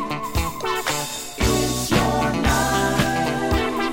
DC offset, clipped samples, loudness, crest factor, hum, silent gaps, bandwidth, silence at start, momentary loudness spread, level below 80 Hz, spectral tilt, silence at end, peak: under 0.1%; under 0.1%; -21 LUFS; 16 dB; none; none; 17 kHz; 0 s; 6 LU; -32 dBFS; -4 dB/octave; 0 s; -6 dBFS